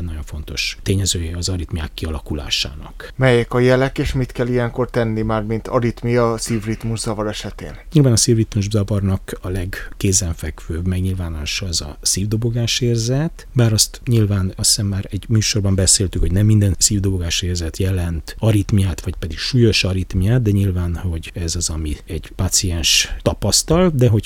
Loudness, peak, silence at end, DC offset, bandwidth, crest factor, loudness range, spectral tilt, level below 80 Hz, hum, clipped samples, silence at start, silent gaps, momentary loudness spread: -18 LUFS; 0 dBFS; 0 s; under 0.1%; 17.5 kHz; 18 dB; 4 LU; -4.5 dB/octave; -30 dBFS; none; under 0.1%; 0 s; none; 11 LU